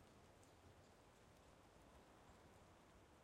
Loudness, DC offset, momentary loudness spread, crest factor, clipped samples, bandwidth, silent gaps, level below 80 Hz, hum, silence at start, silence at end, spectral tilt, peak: -69 LUFS; under 0.1%; 2 LU; 16 dB; under 0.1%; 16 kHz; none; -78 dBFS; none; 0 s; 0 s; -4.5 dB/octave; -52 dBFS